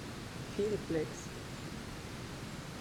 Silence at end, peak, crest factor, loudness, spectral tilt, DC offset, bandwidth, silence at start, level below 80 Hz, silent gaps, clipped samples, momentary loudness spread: 0 s; -22 dBFS; 18 dB; -40 LUFS; -5 dB/octave; under 0.1%; 19.5 kHz; 0 s; -56 dBFS; none; under 0.1%; 8 LU